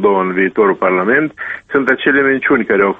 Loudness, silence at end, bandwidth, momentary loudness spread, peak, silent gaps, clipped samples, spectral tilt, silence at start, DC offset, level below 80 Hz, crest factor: -13 LUFS; 0.05 s; 3.9 kHz; 5 LU; 0 dBFS; none; under 0.1%; -8 dB/octave; 0 s; under 0.1%; -52 dBFS; 12 dB